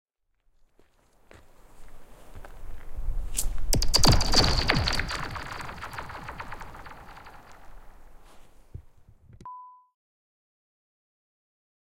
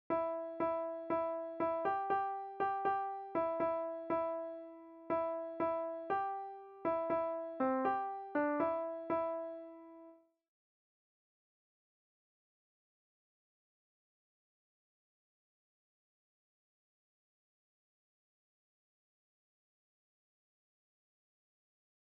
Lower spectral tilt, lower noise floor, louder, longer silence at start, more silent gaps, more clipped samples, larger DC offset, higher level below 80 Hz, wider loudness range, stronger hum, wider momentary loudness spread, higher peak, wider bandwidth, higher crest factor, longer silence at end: second, -3 dB/octave vs -5 dB/octave; first, -69 dBFS vs -61 dBFS; first, -26 LUFS vs -38 LUFS; first, 1.75 s vs 0.1 s; neither; neither; neither; first, -34 dBFS vs -80 dBFS; first, 23 LU vs 5 LU; neither; first, 28 LU vs 11 LU; first, -4 dBFS vs -24 dBFS; first, 16.5 kHz vs 5.2 kHz; first, 24 dB vs 18 dB; second, 2.3 s vs 11.9 s